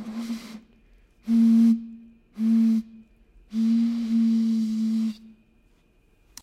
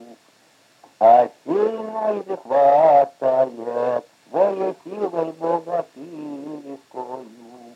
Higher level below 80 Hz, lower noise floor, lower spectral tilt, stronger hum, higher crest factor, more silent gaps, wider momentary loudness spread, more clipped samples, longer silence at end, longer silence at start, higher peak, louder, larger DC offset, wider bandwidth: first, -62 dBFS vs under -90 dBFS; first, -61 dBFS vs -56 dBFS; about the same, -7 dB/octave vs -7 dB/octave; neither; second, 12 dB vs 18 dB; neither; second, 17 LU vs 20 LU; neither; first, 1.15 s vs 0.05 s; about the same, 0 s vs 0 s; second, -12 dBFS vs -4 dBFS; second, -23 LUFS vs -20 LUFS; neither; about the same, 8.2 kHz vs 8.6 kHz